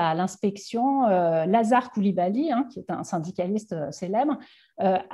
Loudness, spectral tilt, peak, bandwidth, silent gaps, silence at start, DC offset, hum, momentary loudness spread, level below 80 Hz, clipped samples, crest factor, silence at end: -25 LUFS; -6.5 dB/octave; -8 dBFS; 12 kHz; none; 0 s; under 0.1%; none; 9 LU; -72 dBFS; under 0.1%; 16 dB; 0 s